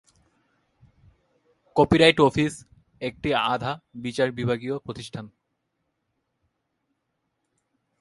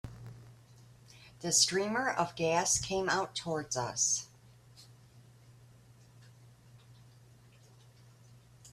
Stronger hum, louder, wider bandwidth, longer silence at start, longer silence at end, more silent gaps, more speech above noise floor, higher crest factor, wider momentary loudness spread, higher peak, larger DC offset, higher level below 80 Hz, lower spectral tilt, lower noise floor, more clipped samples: neither; first, -23 LUFS vs -31 LUFS; second, 11.5 kHz vs 15.5 kHz; first, 1.75 s vs 0.05 s; first, 2.75 s vs 0.05 s; neither; first, 54 dB vs 27 dB; about the same, 24 dB vs 24 dB; about the same, 19 LU vs 20 LU; first, -2 dBFS vs -12 dBFS; neither; first, -52 dBFS vs -64 dBFS; first, -5.5 dB/octave vs -2 dB/octave; first, -77 dBFS vs -59 dBFS; neither